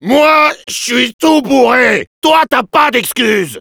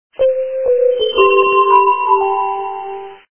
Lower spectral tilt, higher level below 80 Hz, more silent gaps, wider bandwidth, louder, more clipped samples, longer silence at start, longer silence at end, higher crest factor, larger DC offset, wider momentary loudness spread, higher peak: second, -3 dB/octave vs -7 dB/octave; about the same, -52 dBFS vs -54 dBFS; first, 1.14-1.19 s, 2.07-2.22 s vs none; first, over 20 kHz vs 3.4 kHz; first, -10 LUFS vs -13 LUFS; neither; second, 0 s vs 0.2 s; second, 0 s vs 0.25 s; about the same, 10 dB vs 14 dB; second, under 0.1% vs 0.6%; second, 5 LU vs 14 LU; about the same, 0 dBFS vs 0 dBFS